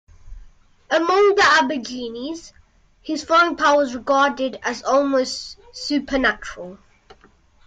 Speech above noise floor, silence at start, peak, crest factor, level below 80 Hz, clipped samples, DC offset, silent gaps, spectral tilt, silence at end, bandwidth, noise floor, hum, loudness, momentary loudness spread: 34 dB; 0.25 s; -6 dBFS; 14 dB; -48 dBFS; under 0.1%; under 0.1%; none; -2.5 dB/octave; 0.9 s; 9.2 kHz; -54 dBFS; none; -19 LUFS; 18 LU